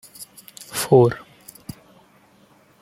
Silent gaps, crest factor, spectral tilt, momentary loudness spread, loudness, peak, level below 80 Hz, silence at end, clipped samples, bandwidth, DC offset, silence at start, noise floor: none; 22 dB; -6 dB/octave; 25 LU; -18 LUFS; -2 dBFS; -58 dBFS; 1.65 s; under 0.1%; 16.5 kHz; under 0.1%; 0.2 s; -55 dBFS